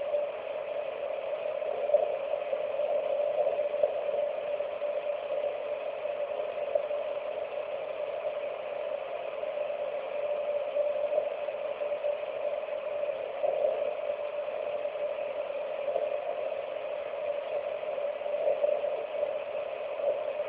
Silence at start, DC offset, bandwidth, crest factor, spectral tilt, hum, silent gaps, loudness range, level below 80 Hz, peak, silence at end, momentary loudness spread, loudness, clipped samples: 0 s; under 0.1%; 4 kHz; 20 dB; -1 dB/octave; none; none; 4 LU; -74 dBFS; -12 dBFS; 0 s; 6 LU; -33 LUFS; under 0.1%